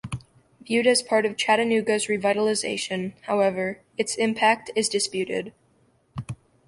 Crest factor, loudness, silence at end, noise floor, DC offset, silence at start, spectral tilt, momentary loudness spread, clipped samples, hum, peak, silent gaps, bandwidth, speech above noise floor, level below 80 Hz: 18 dB; -23 LUFS; 0.35 s; -63 dBFS; under 0.1%; 0.05 s; -3.5 dB/octave; 16 LU; under 0.1%; none; -6 dBFS; none; 11.5 kHz; 40 dB; -60 dBFS